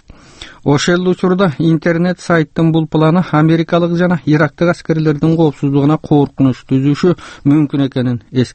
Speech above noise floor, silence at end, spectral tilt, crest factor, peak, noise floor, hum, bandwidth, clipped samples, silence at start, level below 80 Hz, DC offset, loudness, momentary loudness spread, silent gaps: 24 dB; 0.05 s; -7.5 dB/octave; 12 dB; 0 dBFS; -36 dBFS; none; 8.6 kHz; under 0.1%; 0.1 s; -44 dBFS; under 0.1%; -13 LUFS; 4 LU; none